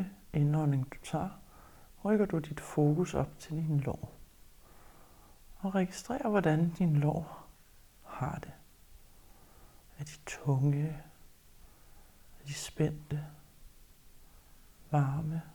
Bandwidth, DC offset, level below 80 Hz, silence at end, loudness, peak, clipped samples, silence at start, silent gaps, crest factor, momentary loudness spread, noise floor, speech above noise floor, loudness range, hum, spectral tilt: 19.5 kHz; under 0.1%; -56 dBFS; 0.05 s; -33 LUFS; -14 dBFS; under 0.1%; 0 s; none; 20 dB; 18 LU; -59 dBFS; 27 dB; 8 LU; none; -7.5 dB/octave